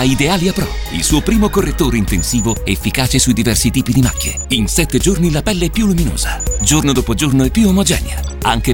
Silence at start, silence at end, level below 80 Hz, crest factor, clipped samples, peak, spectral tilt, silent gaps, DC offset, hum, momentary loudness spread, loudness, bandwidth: 0 s; 0 s; -22 dBFS; 14 dB; under 0.1%; 0 dBFS; -4.5 dB/octave; none; under 0.1%; none; 5 LU; -14 LUFS; over 20 kHz